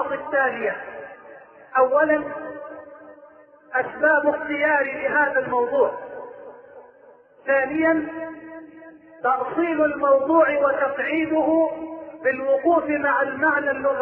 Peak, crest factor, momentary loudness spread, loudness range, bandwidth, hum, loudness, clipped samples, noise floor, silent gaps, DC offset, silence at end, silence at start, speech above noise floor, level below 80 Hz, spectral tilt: -6 dBFS; 16 dB; 18 LU; 5 LU; 3.4 kHz; none; -21 LUFS; under 0.1%; -51 dBFS; none; under 0.1%; 0 s; 0 s; 30 dB; -62 dBFS; -9 dB/octave